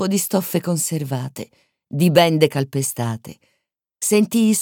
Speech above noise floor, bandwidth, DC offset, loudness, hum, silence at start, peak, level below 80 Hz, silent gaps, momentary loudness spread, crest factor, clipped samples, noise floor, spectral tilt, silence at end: 55 dB; 19 kHz; under 0.1%; -19 LUFS; none; 0 s; -2 dBFS; -62 dBFS; none; 16 LU; 18 dB; under 0.1%; -73 dBFS; -5 dB/octave; 0 s